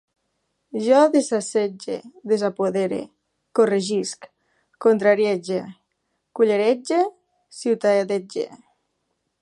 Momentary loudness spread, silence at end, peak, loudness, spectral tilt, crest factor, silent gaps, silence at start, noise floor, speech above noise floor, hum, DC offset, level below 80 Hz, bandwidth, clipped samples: 14 LU; 0.85 s; -4 dBFS; -21 LUFS; -5 dB/octave; 18 dB; none; 0.75 s; -74 dBFS; 54 dB; none; under 0.1%; -74 dBFS; 11.5 kHz; under 0.1%